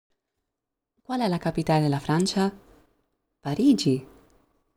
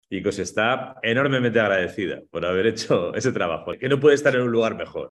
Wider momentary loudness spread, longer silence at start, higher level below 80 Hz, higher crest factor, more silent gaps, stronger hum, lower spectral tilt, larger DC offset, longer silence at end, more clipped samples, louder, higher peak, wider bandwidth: about the same, 10 LU vs 9 LU; first, 1.1 s vs 0.1 s; about the same, -56 dBFS vs -58 dBFS; about the same, 18 dB vs 16 dB; neither; neither; about the same, -6 dB/octave vs -5 dB/octave; neither; first, 0.7 s vs 0 s; neither; second, -25 LUFS vs -22 LUFS; second, -10 dBFS vs -6 dBFS; first, 15.5 kHz vs 12 kHz